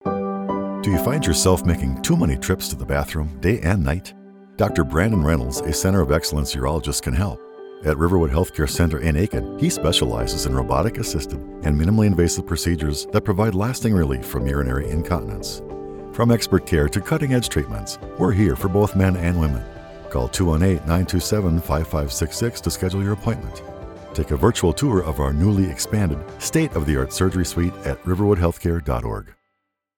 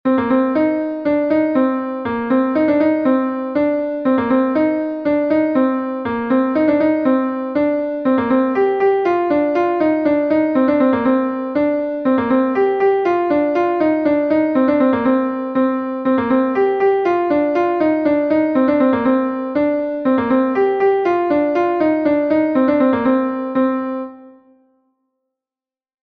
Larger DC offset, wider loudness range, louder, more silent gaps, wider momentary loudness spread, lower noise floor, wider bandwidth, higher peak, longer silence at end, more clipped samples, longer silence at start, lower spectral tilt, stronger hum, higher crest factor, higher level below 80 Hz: neither; about the same, 2 LU vs 1 LU; second, -21 LUFS vs -16 LUFS; neither; first, 9 LU vs 4 LU; second, -76 dBFS vs under -90 dBFS; first, 19 kHz vs 5.2 kHz; about the same, -4 dBFS vs -4 dBFS; second, 0.65 s vs 1.75 s; neither; about the same, 0.05 s vs 0.05 s; second, -5.5 dB/octave vs -8.5 dB/octave; neither; first, 18 dB vs 12 dB; first, -30 dBFS vs -54 dBFS